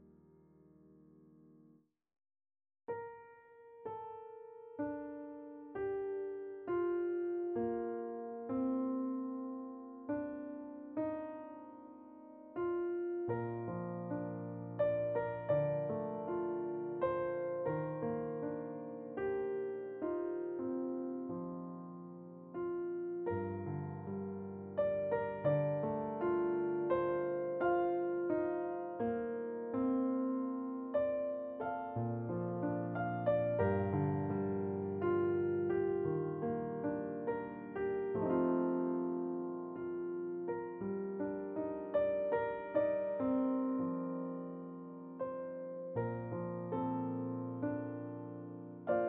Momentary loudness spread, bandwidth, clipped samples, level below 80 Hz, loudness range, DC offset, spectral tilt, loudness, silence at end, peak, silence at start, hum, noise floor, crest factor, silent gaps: 12 LU; 3.8 kHz; under 0.1%; -72 dBFS; 8 LU; under 0.1%; -9 dB/octave; -38 LUFS; 0 s; -20 dBFS; 0 s; none; -68 dBFS; 18 dB; none